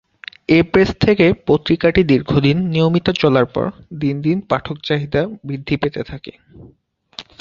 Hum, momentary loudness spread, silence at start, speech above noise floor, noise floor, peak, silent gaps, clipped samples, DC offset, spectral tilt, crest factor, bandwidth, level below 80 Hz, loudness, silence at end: none; 17 LU; 0.5 s; 23 dB; -39 dBFS; 0 dBFS; none; under 0.1%; under 0.1%; -7.5 dB/octave; 16 dB; 7.4 kHz; -40 dBFS; -16 LUFS; 0.2 s